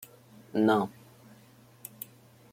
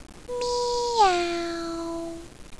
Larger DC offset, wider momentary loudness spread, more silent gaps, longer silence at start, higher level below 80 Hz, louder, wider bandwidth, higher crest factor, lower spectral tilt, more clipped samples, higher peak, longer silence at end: second, under 0.1% vs 0.3%; first, 22 LU vs 15 LU; neither; first, 0.55 s vs 0 s; second, -74 dBFS vs -48 dBFS; about the same, -28 LUFS vs -26 LUFS; first, 16.5 kHz vs 11 kHz; about the same, 20 dB vs 18 dB; first, -6 dB/octave vs -3 dB/octave; neither; second, -12 dBFS vs -8 dBFS; first, 1.65 s vs 0 s